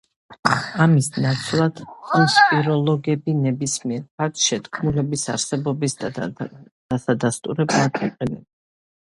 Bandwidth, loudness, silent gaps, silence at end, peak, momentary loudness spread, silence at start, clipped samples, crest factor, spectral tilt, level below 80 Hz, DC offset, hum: 11.5 kHz; -21 LUFS; 0.39-0.43 s, 4.11-4.18 s, 6.71-6.89 s; 0.75 s; 0 dBFS; 12 LU; 0.3 s; under 0.1%; 22 dB; -4.5 dB/octave; -54 dBFS; under 0.1%; none